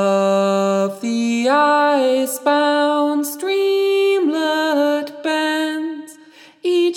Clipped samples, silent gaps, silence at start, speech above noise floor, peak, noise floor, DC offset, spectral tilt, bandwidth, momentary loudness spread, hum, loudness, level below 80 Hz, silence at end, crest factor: under 0.1%; none; 0 s; 29 dB; -2 dBFS; -45 dBFS; under 0.1%; -4.5 dB/octave; over 20 kHz; 7 LU; none; -17 LUFS; -80 dBFS; 0 s; 14 dB